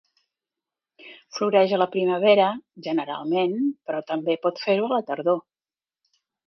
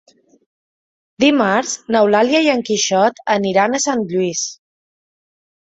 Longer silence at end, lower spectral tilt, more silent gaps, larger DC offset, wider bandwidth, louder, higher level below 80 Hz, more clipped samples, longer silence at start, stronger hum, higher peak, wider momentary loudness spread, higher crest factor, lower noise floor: second, 1.05 s vs 1.25 s; first, -6 dB/octave vs -3.5 dB/octave; neither; neither; second, 6.4 kHz vs 8.4 kHz; second, -23 LUFS vs -16 LUFS; second, -78 dBFS vs -60 dBFS; neither; second, 1.05 s vs 1.2 s; neither; second, -6 dBFS vs -2 dBFS; first, 9 LU vs 6 LU; about the same, 18 dB vs 16 dB; about the same, under -90 dBFS vs under -90 dBFS